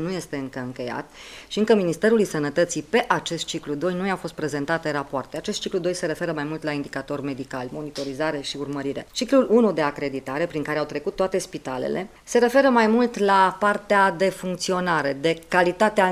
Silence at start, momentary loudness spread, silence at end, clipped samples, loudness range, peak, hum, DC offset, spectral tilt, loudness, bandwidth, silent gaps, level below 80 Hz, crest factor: 0 s; 12 LU; 0 s; under 0.1%; 8 LU; -4 dBFS; none; under 0.1%; -4.5 dB/octave; -23 LUFS; 15.5 kHz; none; -56 dBFS; 20 dB